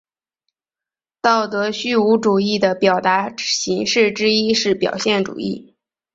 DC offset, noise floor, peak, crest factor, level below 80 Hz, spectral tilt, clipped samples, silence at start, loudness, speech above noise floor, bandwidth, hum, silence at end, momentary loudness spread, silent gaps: under 0.1%; -90 dBFS; -2 dBFS; 18 dB; -60 dBFS; -3.5 dB/octave; under 0.1%; 1.25 s; -17 LUFS; 72 dB; 8 kHz; none; 0.55 s; 6 LU; none